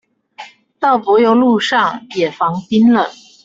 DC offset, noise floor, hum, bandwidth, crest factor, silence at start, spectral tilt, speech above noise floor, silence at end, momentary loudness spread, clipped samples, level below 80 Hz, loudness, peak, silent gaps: under 0.1%; -37 dBFS; none; 7.8 kHz; 14 dB; 0.4 s; -5.5 dB/octave; 24 dB; 0.35 s; 8 LU; under 0.1%; -58 dBFS; -14 LUFS; 0 dBFS; none